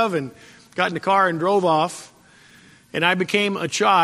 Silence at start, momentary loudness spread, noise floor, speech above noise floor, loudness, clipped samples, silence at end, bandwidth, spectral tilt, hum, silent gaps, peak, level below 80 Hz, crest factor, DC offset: 0 s; 13 LU; -50 dBFS; 30 dB; -20 LUFS; under 0.1%; 0 s; 13.5 kHz; -4 dB/octave; none; none; -2 dBFS; -68 dBFS; 18 dB; under 0.1%